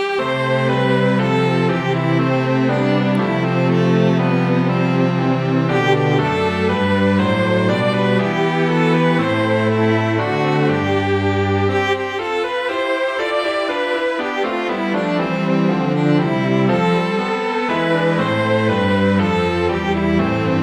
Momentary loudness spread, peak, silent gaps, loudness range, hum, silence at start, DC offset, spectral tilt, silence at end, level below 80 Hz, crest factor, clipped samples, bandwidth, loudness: 4 LU; -2 dBFS; none; 2 LU; none; 0 s; under 0.1%; -7 dB/octave; 0 s; -48 dBFS; 14 dB; under 0.1%; 10 kHz; -17 LUFS